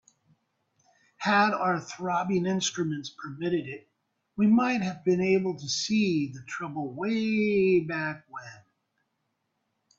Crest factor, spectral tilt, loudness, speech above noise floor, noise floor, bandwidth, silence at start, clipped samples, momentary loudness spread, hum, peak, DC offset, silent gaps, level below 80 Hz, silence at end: 16 dB; -5 dB/octave; -27 LUFS; 52 dB; -78 dBFS; 7.8 kHz; 1.2 s; under 0.1%; 15 LU; none; -12 dBFS; under 0.1%; none; -68 dBFS; 1.4 s